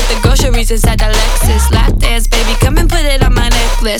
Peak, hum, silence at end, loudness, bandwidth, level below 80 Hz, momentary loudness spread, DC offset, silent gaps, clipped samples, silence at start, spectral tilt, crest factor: 0 dBFS; none; 0 s; -12 LUFS; 17 kHz; -10 dBFS; 2 LU; under 0.1%; none; under 0.1%; 0 s; -4 dB/octave; 8 dB